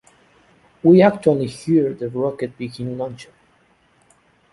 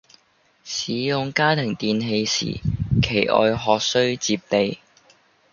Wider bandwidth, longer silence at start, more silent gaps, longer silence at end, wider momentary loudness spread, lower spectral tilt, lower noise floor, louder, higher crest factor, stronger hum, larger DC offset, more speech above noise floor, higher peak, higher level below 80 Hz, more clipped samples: first, 11.5 kHz vs 7.4 kHz; first, 0.85 s vs 0.65 s; neither; first, 1.3 s vs 0.75 s; first, 16 LU vs 7 LU; first, -8 dB/octave vs -4.5 dB/octave; about the same, -58 dBFS vs -61 dBFS; about the same, -19 LUFS vs -21 LUFS; about the same, 18 dB vs 20 dB; neither; neither; about the same, 40 dB vs 40 dB; about the same, -2 dBFS vs -2 dBFS; second, -58 dBFS vs -42 dBFS; neither